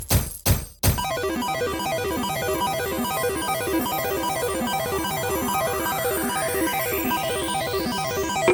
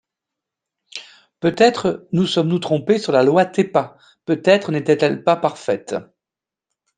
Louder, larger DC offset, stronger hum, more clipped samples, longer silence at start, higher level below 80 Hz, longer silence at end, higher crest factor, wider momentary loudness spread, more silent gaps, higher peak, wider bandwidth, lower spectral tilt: second, -24 LUFS vs -18 LUFS; neither; neither; neither; second, 0 s vs 0.95 s; first, -38 dBFS vs -64 dBFS; second, 0 s vs 0.95 s; about the same, 18 dB vs 18 dB; second, 2 LU vs 17 LU; neither; second, -6 dBFS vs 0 dBFS; first, 18 kHz vs 9.6 kHz; second, -4 dB/octave vs -6 dB/octave